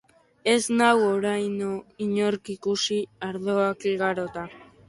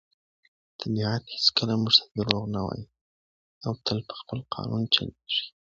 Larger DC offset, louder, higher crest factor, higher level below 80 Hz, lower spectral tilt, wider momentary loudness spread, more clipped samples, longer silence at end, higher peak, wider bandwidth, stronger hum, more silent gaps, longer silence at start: neither; about the same, -25 LUFS vs -26 LUFS; second, 18 dB vs 28 dB; second, -66 dBFS vs -56 dBFS; about the same, -4 dB/octave vs -5 dB/octave; second, 11 LU vs 15 LU; neither; about the same, 0.25 s vs 0.3 s; second, -6 dBFS vs 0 dBFS; first, 11.5 kHz vs 7.6 kHz; neither; second, none vs 3.01-3.61 s; second, 0.45 s vs 0.8 s